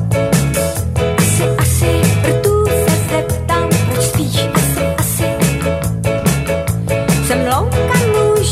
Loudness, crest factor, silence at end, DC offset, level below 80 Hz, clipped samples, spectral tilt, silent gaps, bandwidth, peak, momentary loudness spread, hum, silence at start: -14 LUFS; 14 dB; 0 s; under 0.1%; -28 dBFS; under 0.1%; -5 dB/octave; none; 16 kHz; 0 dBFS; 4 LU; none; 0 s